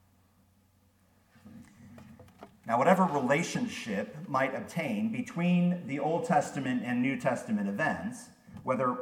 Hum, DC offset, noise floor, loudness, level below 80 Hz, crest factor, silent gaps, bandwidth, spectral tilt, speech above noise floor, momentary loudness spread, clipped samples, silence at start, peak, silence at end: none; under 0.1%; -66 dBFS; -30 LUFS; -72 dBFS; 22 dB; none; 15 kHz; -6 dB/octave; 37 dB; 10 LU; under 0.1%; 1.45 s; -10 dBFS; 0 s